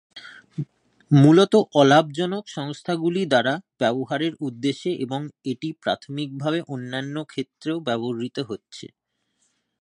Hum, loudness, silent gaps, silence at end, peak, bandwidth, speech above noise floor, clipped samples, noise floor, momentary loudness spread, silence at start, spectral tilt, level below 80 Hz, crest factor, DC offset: none; -22 LUFS; none; 0.95 s; -2 dBFS; 10.5 kHz; 50 dB; under 0.1%; -72 dBFS; 18 LU; 0.15 s; -6.5 dB/octave; -68 dBFS; 20 dB; under 0.1%